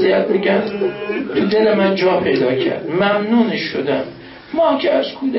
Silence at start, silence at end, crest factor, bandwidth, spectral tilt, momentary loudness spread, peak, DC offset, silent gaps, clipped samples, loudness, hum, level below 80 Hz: 0 s; 0 s; 14 dB; 5.8 kHz; -10 dB/octave; 7 LU; -2 dBFS; under 0.1%; none; under 0.1%; -17 LUFS; none; -54 dBFS